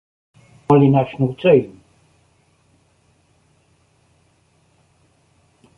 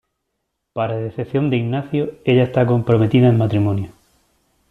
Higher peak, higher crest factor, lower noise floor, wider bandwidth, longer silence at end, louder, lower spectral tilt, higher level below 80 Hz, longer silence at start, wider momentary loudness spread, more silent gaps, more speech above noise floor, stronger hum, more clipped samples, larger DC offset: about the same, -2 dBFS vs -4 dBFS; about the same, 20 dB vs 16 dB; second, -59 dBFS vs -75 dBFS; about the same, 4.5 kHz vs 4.2 kHz; first, 4.1 s vs 0.8 s; about the same, -16 LUFS vs -18 LUFS; about the same, -9.5 dB/octave vs -9.5 dB/octave; about the same, -56 dBFS vs -52 dBFS; about the same, 0.7 s vs 0.75 s; first, 18 LU vs 11 LU; neither; second, 45 dB vs 58 dB; neither; neither; neither